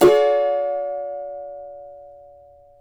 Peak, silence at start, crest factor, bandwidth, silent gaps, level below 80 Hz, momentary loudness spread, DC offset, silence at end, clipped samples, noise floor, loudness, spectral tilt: -4 dBFS; 0 s; 18 dB; over 20 kHz; none; -54 dBFS; 24 LU; under 0.1%; 0.7 s; under 0.1%; -48 dBFS; -21 LUFS; -5 dB/octave